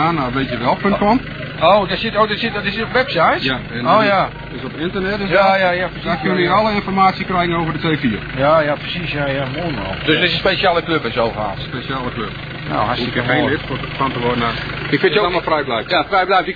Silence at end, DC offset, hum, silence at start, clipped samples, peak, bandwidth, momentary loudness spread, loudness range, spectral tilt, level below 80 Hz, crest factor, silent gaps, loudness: 0 s; 0.2%; none; 0 s; under 0.1%; -2 dBFS; 5 kHz; 9 LU; 3 LU; -7.5 dB/octave; -38 dBFS; 16 dB; none; -17 LUFS